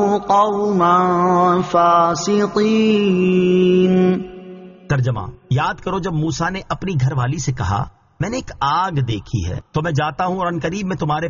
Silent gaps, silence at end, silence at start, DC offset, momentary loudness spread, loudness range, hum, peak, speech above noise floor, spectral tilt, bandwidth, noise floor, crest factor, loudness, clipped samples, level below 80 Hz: none; 0 s; 0 s; under 0.1%; 10 LU; 6 LU; none; -2 dBFS; 20 dB; -6 dB/octave; 7.2 kHz; -37 dBFS; 14 dB; -17 LUFS; under 0.1%; -42 dBFS